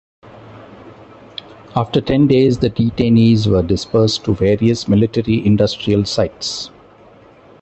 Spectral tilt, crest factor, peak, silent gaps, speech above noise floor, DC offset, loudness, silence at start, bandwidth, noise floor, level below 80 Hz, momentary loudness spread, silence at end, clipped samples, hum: -7 dB/octave; 16 dB; 0 dBFS; none; 30 dB; under 0.1%; -15 LUFS; 0.45 s; 8.4 kHz; -44 dBFS; -38 dBFS; 13 LU; 0.95 s; under 0.1%; none